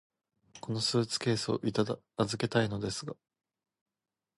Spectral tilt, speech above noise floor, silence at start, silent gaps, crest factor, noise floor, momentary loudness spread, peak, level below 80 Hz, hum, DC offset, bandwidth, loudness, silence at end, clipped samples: -5 dB/octave; 28 dB; 0.55 s; none; 20 dB; -59 dBFS; 11 LU; -14 dBFS; -64 dBFS; none; under 0.1%; 11.5 kHz; -32 LUFS; 1.25 s; under 0.1%